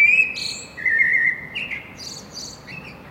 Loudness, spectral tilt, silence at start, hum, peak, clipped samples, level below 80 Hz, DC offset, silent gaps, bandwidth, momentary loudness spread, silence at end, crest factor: -19 LUFS; -1 dB/octave; 0 s; none; -6 dBFS; under 0.1%; -54 dBFS; under 0.1%; none; 16 kHz; 19 LU; 0 s; 16 dB